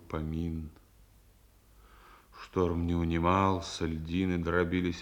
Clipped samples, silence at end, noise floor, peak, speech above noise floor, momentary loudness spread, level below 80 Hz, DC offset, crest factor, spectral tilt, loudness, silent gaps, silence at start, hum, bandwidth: under 0.1%; 0 s; -61 dBFS; -12 dBFS; 31 dB; 10 LU; -50 dBFS; under 0.1%; 20 dB; -6.5 dB/octave; -31 LUFS; none; 0.05 s; none; 16.5 kHz